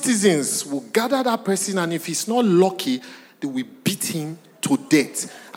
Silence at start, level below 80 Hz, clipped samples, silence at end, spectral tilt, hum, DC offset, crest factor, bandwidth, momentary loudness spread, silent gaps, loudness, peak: 0 s; -76 dBFS; under 0.1%; 0 s; -4 dB/octave; none; under 0.1%; 18 dB; 17 kHz; 11 LU; none; -21 LUFS; -4 dBFS